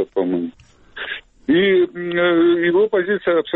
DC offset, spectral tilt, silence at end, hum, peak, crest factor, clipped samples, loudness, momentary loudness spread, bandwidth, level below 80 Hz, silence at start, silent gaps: under 0.1%; -8 dB/octave; 0 s; none; -6 dBFS; 12 dB; under 0.1%; -18 LUFS; 13 LU; 4.1 kHz; -56 dBFS; 0 s; none